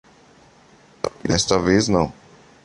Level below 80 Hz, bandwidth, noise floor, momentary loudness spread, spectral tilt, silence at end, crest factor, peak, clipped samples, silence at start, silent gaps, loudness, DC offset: -42 dBFS; 11.5 kHz; -51 dBFS; 12 LU; -4.5 dB/octave; 0.5 s; 20 dB; -2 dBFS; under 0.1%; 1.05 s; none; -20 LUFS; under 0.1%